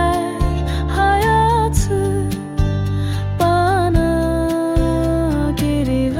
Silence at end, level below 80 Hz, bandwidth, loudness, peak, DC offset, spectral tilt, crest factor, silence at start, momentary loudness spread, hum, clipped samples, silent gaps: 0 s; -24 dBFS; 16.5 kHz; -17 LUFS; -4 dBFS; under 0.1%; -6.5 dB/octave; 12 dB; 0 s; 6 LU; none; under 0.1%; none